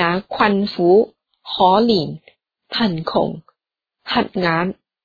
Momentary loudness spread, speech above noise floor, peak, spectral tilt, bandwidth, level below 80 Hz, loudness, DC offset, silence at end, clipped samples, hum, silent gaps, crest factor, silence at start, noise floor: 14 LU; 63 dB; 0 dBFS; -7.5 dB/octave; 5 kHz; -54 dBFS; -18 LUFS; under 0.1%; 0.3 s; under 0.1%; none; none; 18 dB; 0 s; -80 dBFS